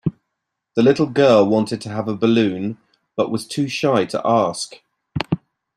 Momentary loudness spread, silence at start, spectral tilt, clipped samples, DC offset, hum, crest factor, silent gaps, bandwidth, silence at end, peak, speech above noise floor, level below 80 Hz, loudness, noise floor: 14 LU; 0.05 s; -6 dB/octave; under 0.1%; under 0.1%; none; 18 dB; none; 13 kHz; 0.4 s; -2 dBFS; 61 dB; -56 dBFS; -19 LUFS; -79 dBFS